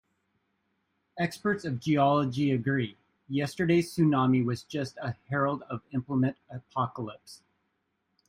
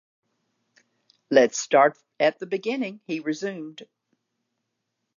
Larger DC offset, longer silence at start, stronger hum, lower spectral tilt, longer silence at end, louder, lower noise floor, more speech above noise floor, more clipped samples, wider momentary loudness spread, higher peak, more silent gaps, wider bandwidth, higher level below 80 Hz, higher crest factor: neither; second, 1.15 s vs 1.3 s; neither; first, -7 dB/octave vs -3.5 dB/octave; second, 0.95 s vs 1.35 s; second, -29 LUFS vs -23 LUFS; about the same, -78 dBFS vs -80 dBFS; second, 50 dB vs 57 dB; neither; about the same, 13 LU vs 12 LU; second, -12 dBFS vs -4 dBFS; neither; first, 16 kHz vs 7.6 kHz; first, -66 dBFS vs -86 dBFS; second, 16 dB vs 22 dB